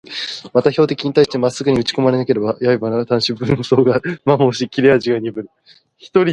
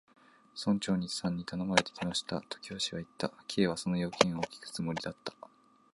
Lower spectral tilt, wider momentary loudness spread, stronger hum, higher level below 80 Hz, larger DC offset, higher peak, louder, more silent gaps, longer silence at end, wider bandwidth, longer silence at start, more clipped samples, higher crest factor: first, -6 dB/octave vs -4.5 dB/octave; second, 6 LU vs 10 LU; neither; first, -50 dBFS vs -64 dBFS; neither; first, 0 dBFS vs -4 dBFS; first, -16 LUFS vs -33 LUFS; neither; second, 0 s vs 0.6 s; about the same, 10.5 kHz vs 11.5 kHz; second, 0.1 s vs 0.55 s; neither; second, 16 dB vs 32 dB